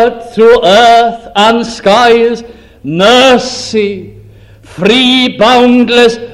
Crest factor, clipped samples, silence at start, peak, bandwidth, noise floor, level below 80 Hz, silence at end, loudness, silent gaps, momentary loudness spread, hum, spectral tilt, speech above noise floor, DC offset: 8 dB; 2%; 0 s; 0 dBFS; 13 kHz; -35 dBFS; -40 dBFS; 0 s; -7 LUFS; none; 9 LU; none; -4 dB/octave; 28 dB; under 0.1%